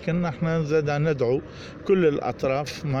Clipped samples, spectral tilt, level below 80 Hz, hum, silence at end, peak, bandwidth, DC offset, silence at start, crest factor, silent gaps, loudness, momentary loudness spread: under 0.1%; -7.5 dB/octave; -50 dBFS; none; 0 s; -10 dBFS; 10.5 kHz; under 0.1%; 0 s; 14 dB; none; -24 LUFS; 7 LU